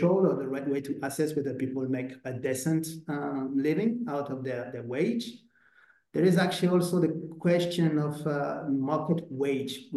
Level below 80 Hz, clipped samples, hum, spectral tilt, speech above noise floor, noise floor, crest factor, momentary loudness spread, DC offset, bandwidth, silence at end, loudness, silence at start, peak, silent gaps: -74 dBFS; under 0.1%; none; -6.5 dB/octave; 34 dB; -62 dBFS; 16 dB; 9 LU; under 0.1%; 12.5 kHz; 0 s; -29 LUFS; 0 s; -14 dBFS; none